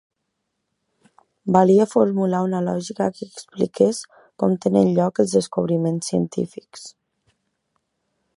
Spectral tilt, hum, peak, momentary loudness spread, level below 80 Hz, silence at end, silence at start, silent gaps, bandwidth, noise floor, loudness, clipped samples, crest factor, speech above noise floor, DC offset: -7 dB/octave; none; -2 dBFS; 18 LU; -64 dBFS; 1.45 s; 1.45 s; none; 11.5 kHz; -77 dBFS; -20 LUFS; under 0.1%; 20 dB; 57 dB; under 0.1%